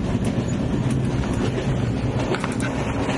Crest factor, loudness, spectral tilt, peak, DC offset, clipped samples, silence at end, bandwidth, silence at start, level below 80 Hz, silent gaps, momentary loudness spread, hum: 14 dB; -23 LUFS; -6.5 dB/octave; -8 dBFS; under 0.1%; under 0.1%; 0 s; 11.5 kHz; 0 s; -34 dBFS; none; 2 LU; none